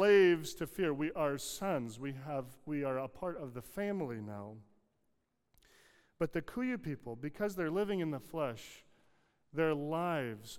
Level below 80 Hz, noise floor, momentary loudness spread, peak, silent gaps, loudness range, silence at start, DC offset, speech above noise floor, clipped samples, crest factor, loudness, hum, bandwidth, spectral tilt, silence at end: -64 dBFS; -79 dBFS; 10 LU; -18 dBFS; none; 6 LU; 0 s; under 0.1%; 41 dB; under 0.1%; 20 dB; -37 LUFS; none; 16.5 kHz; -5.5 dB/octave; 0 s